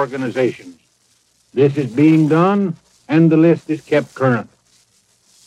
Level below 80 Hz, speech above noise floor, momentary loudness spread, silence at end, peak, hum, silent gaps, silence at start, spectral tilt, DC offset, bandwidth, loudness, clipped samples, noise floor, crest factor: -64 dBFS; 44 dB; 11 LU; 1.05 s; -2 dBFS; none; none; 0 s; -8.5 dB/octave; under 0.1%; 9.6 kHz; -16 LUFS; under 0.1%; -59 dBFS; 16 dB